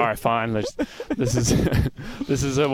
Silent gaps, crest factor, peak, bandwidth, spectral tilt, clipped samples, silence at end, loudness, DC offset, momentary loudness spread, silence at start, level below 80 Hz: none; 16 dB; -6 dBFS; 17 kHz; -5.5 dB/octave; under 0.1%; 0 s; -23 LUFS; under 0.1%; 8 LU; 0 s; -36 dBFS